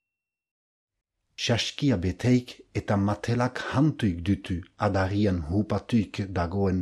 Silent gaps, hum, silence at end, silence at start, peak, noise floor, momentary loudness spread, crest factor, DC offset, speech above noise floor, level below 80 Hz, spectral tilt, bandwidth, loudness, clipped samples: none; none; 0 s; 1.4 s; -10 dBFS; -88 dBFS; 6 LU; 16 dB; under 0.1%; 63 dB; -48 dBFS; -6.5 dB/octave; 12 kHz; -27 LUFS; under 0.1%